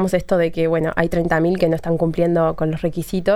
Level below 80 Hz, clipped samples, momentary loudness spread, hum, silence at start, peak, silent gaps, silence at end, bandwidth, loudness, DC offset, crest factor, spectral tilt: -38 dBFS; under 0.1%; 4 LU; none; 0 s; -2 dBFS; none; 0 s; 15 kHz; -19 LUFS; under 0.1%; 16 dB; -7.5 dB/octave